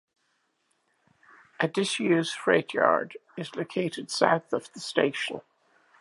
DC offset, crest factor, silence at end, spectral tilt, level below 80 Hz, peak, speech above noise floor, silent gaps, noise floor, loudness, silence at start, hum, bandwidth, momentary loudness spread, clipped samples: under 0.1%; 24 dB; 0.6 s; -4.5 dB/octave; -80 dBFS; -4 dBFS; 47 dB; none; -73 dBFS; -27 LUFS; 1.6 s; none; 11.5 kHz; 11 LU; under 0.1%